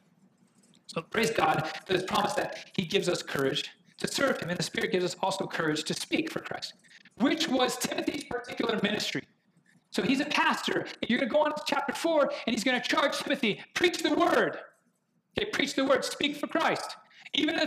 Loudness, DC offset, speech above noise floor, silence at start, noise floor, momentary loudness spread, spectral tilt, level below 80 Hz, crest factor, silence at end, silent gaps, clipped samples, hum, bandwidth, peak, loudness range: -29 LUFS; under 0.1%; 44 dB; 0.9 s; -73 dBFS; 10 LU; -3.5 dB/octave; -66 dBFS; 20 dB; 0 s; none; under 0.1%; none; 16 kHz; -8 dBFS; 3 LU